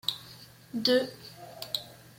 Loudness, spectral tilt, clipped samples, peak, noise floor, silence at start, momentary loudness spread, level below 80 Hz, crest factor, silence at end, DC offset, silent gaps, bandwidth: -30 LUFS; -3.5 dB/octave; under 0.1%; -10 dBFS; -51 dBFS; 0.05 s; 21 LU; -70 dBFS; 22 dB; 0.25 s; under 0.1%; none; 16.5 kHz